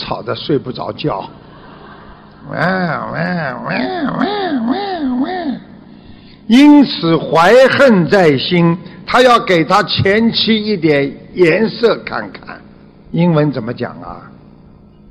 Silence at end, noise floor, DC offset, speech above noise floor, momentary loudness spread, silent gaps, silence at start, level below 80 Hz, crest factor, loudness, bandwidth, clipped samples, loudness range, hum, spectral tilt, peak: 0.8 s; -41 dBFS; under 0.1%; 29 dB; 16 LU; none; 0 s; -46 dBFS; 14 dB; -13 LUFS; 12.5 kHz; under 0.1%; 10 LU; none; -6.5 dB/octave; 0 dBFS